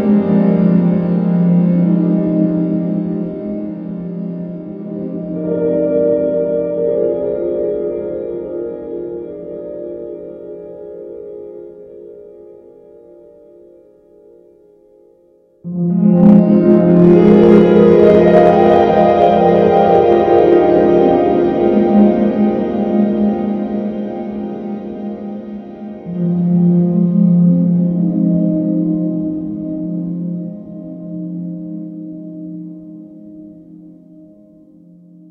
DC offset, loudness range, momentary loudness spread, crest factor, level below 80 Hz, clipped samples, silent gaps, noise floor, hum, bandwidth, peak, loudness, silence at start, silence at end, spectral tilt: under 0.1%; 20 LU; 21 LU; 14 dB; -46 dBFS; under 0.1%; none; -51 dBFS; none; 4.7 kHz; 0 dBFS; -13 LUFS; 0 s; 1.4 s; -10.5 dB/octave